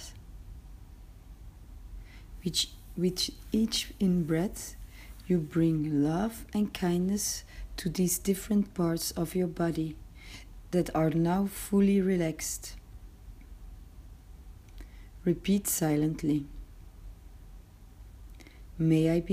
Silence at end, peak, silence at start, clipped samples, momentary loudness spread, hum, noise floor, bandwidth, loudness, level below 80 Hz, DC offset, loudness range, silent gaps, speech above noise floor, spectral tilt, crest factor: 0 s; -14 dBFS; 0 s; under 0.1%; 24 LU; none; -50 dBFS; 15.5 kHz; -30 LUFS; -48 dBFS; under 0.1%; 5 LU; none; 22 dB; -5.5 dB/octave; 18 dB